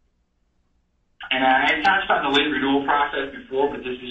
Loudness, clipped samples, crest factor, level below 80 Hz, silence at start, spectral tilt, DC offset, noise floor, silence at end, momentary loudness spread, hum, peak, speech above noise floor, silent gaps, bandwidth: -20 LUFS; under 0.1%; 18 dB; -52 dBFS; 1.2 s; -4.5 dB/octave; under 0.1%; -67 dBFS; 0 s; 9 LU; none; -4 dBFS; 46 dB; none; 8.2 kHz